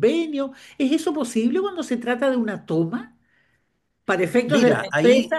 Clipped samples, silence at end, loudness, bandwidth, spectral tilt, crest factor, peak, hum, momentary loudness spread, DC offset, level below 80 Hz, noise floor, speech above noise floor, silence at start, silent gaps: under 0.1%; 0 s; -22 LUFS; 12.5 kHz; -5.5 dB/octave; 18 dB; -4 dBFS; none; 9 LU; under 0.1%; -66 dBFS; -72 dBFS; 51 dB; 0 s; none